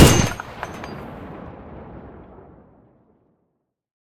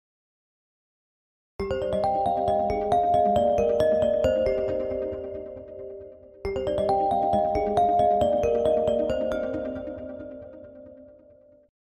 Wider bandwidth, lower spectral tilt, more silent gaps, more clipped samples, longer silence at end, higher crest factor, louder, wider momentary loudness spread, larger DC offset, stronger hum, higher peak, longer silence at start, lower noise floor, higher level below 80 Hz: first, 18 kHz vs 10 kHz; second, -4.5 dB/octave vs -7 dB/octave; neither; neither; first, 2.55 s vs 0.8 s; first, 22 dB vs 16 dB; about the same, -23 LUFS vs -24 LUFS; first, 23 LU vs 18 LU; neither; neither; first, 0 dBFS vs -10 dBFS; second, 0 s vs 1.6 s; first, -73 dBFS vs -55 dBFS; first, -36 dBFS vs -46 dBFS